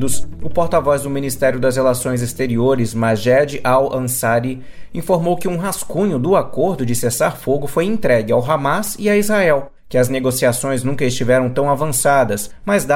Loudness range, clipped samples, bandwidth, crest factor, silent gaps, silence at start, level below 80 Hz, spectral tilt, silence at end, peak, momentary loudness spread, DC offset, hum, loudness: 2 LU; under 0.1%; 16.5 kHz; 14 dB; none; 0 s; -40 dBFS; -5 dB/octave; 0 s; -2 dBFS; 6 LU; under 0.1%; none; -17 LUFS